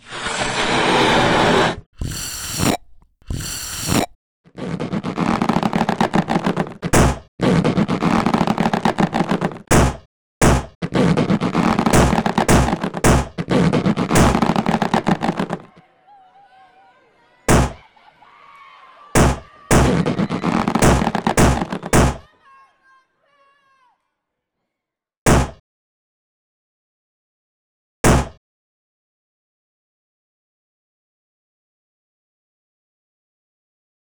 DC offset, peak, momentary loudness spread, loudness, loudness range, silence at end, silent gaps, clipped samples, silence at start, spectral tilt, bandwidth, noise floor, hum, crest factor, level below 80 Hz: under 0.1%; -6 dBFS; 10 LU; -18 LUFS; 8 LU; 5.8 s; 1.86-1.93 s, 4.15-4.44 s, 7.28-7.38 s, 10.06-10.41 s, 10.75-10.81 s, 25.17-25.26 s, 25.60-28.04 s; under 0.1%; 0.1 s; -5 dB/octave; over 20 kHz; -83 dBFS; none; 14 dB; -30 dBFS